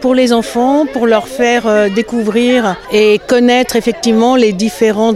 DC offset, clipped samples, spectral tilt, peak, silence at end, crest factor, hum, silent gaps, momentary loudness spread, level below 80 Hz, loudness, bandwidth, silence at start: under 0.1%; under 0.1%; -4.5 dB/octave; 0 dBFS; 0 s; 10 dB; none; none; 4 LU; -44 dBFS; -11 LUFS; 15 kHz; 0 s